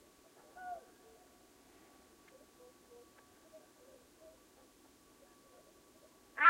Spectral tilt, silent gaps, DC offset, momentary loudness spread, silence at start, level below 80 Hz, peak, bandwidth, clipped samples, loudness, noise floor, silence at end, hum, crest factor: -1.5 dB/octave; none; under 0.1%; 12 LU; 0.55 s; -80 dBFS; -12 dBFS; 16 kHz; under 0.1%; -58 LUFS; -65 dBFS; 0 s; none; 28 dB